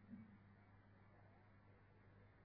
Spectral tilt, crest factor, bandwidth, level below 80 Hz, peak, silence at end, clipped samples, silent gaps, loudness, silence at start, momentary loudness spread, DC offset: -7.5 dB/octave; 18 dB; 4.8 kHz; -80 dBFS; -48 dBFS; 0 s; under 0.1%; none; -67 LUFS; 0 s; 8 LU; under 0.1%